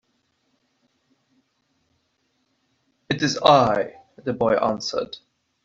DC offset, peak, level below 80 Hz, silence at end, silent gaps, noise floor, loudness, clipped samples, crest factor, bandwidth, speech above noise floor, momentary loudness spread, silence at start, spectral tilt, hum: under 0.1%; -2 dBFS; -58 dBFS; 0.5 s; none; -70 dBFS; -21 LUFS; under 0.1%; 22 dB; 7.8 kHz; 50 dB; 17 LU; 3.1 s; -4.5 dB/octave; none